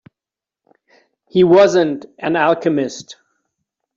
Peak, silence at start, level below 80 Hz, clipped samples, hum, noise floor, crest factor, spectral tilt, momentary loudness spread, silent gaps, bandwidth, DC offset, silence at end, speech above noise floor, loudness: -2 dBFS; 1.35 s; -60 dBFS; under 0.1%; none; -88 dBFS; 16 dB; -6 dB/octave; 14 LU; none; 7.6 kHz; under 0.1%; 0.85 s; 74 dB; -15 LUFS